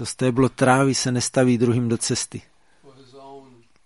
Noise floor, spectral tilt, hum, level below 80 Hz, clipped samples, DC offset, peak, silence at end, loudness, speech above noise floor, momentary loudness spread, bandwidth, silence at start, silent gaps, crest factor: -53 dBFS; -5 dB/octave; none; -54 dBFS; under 0.1%; 0.1%; -2 dBFS; 0.45 s; -20 LUFS; 32 dB; 8 LU; 11.5 kHz; 0 s; none; 20 dB